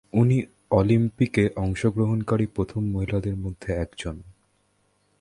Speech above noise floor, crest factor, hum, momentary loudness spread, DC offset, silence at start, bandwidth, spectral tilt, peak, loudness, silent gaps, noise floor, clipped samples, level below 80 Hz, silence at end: 44 dB; 20 dB; none; 10 LU; under 0.1%; 0.15 s; 11 kHz; -8 dB/octave; -4 dBFS; -25 LUFS; none; -67 dBFS; under 0.1%; -42 dBFS; 0.9 s